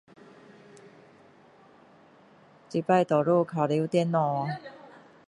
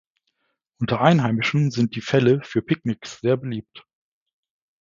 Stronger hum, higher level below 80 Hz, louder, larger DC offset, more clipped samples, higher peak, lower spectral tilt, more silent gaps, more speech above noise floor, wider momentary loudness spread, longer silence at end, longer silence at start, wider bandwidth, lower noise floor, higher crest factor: neither; second, -74 dBFS vs -60 dBFS; second, -26 LUFS vs -21 LUFS; neither; neither; second, -10 dBFS vs 0 dBFS; about the same, -7.5 dB/octave vs -7 dB/octave; neither; second, 31 dB vs 53 dB; about the same, 11 LU vs 11 LU; second, 0.4 s vs 1.05 s; first, 2.7 s vs 0.8 s; first, 10.5 kHz vs 7.6 kHz; second, -56 dBFS vs -74 dBFS; about the same, 20 dB vs 22 dB